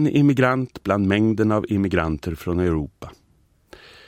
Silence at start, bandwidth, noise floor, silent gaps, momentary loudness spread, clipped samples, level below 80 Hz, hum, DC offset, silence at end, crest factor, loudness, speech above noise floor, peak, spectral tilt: 0 s; 15.5 kHz; -60 dBFS; none; 10 LU; under 0.1%; -42 dBFS; none; under 0.1%; 0.95 s; 18 dB; -21 LUFS; 40 dB; -4 dBFS; -8 dB/octave